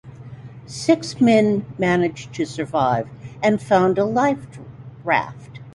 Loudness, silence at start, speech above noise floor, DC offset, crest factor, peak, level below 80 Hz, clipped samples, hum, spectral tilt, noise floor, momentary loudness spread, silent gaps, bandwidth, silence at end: -20 LUFS; 0.05 s; 19 dB; under 0.1%; 18 dB; -2 dBFS; -54 dBFS; under 0.1%; none; -6 dB/octave; -38 dBFS; 22 LU; none; 11.5 kHz; 0.05 s